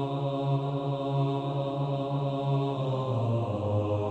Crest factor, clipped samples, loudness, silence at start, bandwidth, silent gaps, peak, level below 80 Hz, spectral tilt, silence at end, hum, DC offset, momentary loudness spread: 12 dB; under 0.1%; -30 LUFS; 0 s; 7.6 kHz; none; -18 dBFS; -64 dBFS; -9 dB/octave; 0 s; none; under 0.1%; 2 LU